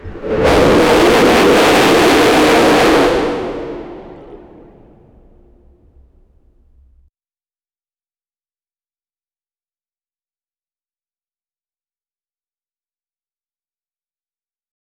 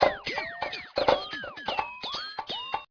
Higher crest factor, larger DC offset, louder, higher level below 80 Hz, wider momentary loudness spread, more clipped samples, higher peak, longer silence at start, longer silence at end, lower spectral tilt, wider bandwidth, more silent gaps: second, 14 dB vs 24 dB; neither; first, -10 LUFS vs -31 LUFS; first, -36 dBFS vs -56 dBFS; first, 15 LU vs 9 LU; neither; first, -2 dBFS vs -6 dBFS; about the same, 0.05 s vs 0 s; first, 10.6 s vs 0.05 s; about the same, -4.5 dB/octave vs -3.5 dB/octave; first, over 20 kHz vs 5.4 kHz; neither